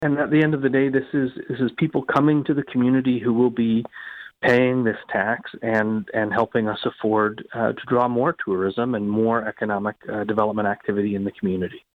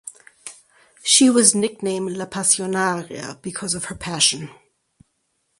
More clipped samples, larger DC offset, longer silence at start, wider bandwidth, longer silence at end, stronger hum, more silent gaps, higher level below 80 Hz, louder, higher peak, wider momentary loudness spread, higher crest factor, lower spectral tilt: neither; neither; about the same, 0 s vs 0.05 s; second, 7.2 kHz vs 11.5 kHz; second, 0.15 s vs 1.1 s; neither; neither; about the same, -60 dBFS vs -58 dBFS; second, -22 LUFS vs -18 LUFS; second, -6 dBFS vs 0 dBFS; second, 7 LU vs 25 LU; second, 16 dB vs 22 dB; first, -8.5 dB/octave vs -2 dB/octave